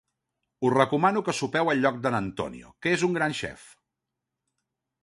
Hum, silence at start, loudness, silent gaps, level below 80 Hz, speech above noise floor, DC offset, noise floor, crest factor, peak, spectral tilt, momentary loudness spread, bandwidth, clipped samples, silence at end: none; 0.6 s; -26 LUFS; none; -60 dBFS; 60 dB; under 0.1%; -85 dBFS; 22 dB; -6 dBFS; -5 dB/octave; 11 LU; 11.5 kHz; under 0.1%; 1.35 s